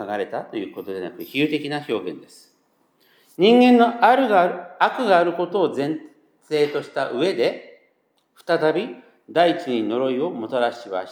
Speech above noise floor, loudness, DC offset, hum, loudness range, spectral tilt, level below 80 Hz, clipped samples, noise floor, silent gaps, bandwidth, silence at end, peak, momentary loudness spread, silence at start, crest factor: 46 dB; -21 LUFS; under 0.1%; none; 7 LU; -6 dB/octave; -84 dBFS; under 0.1%; -66 dBFS; none; 14.5 kHz; 0 s; -2 dBFS; 16 LU; 0 s; 18 dB